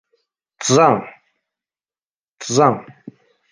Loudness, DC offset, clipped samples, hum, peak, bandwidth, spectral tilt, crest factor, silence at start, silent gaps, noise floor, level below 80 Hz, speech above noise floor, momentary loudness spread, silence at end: -16 LUFS; under 0.1%; under 0.1%; none; -2 dBFS; 10.5 kHz; -4.5 dB/octave; 18 dB; 0.6 s; 2.02-2.11 s, 2.19-2.37 s; under -90 dBFS; -64 dBFS; over 75 dB; 17 LU; 0.7 s